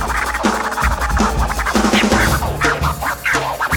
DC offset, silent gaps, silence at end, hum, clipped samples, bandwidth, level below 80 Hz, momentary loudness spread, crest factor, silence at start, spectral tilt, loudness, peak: under 0.1%; none; 0 s; none; under 0.1%; 18 kHz; -24 dBFS; 5 LU; 14 dB; 0 s; -4 dB/octave; -16 LUFS; -4 dBFS